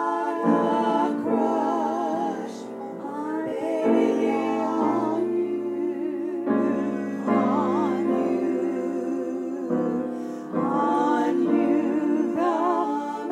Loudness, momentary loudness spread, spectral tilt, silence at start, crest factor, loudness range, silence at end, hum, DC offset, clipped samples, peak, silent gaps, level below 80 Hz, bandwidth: -25 LUFS; 8 LU; -7 dB/octave; 0 s; 14 dB; 2 LU; 0 s; none; under 0.1%; under 0.1%; -10 dBFS; none; -82 dBFS; 10.5 kHz